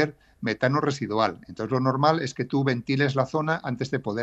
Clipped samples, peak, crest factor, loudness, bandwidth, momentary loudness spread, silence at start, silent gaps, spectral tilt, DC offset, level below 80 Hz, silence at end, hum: under 0.1%; -6 dBFS; 20 dB; -25 LUFS; 8.2 kHz; 6 LU; 0 s; none; -6.5 dB/octave; under 0.1%; -62 dBFS; 0 s; none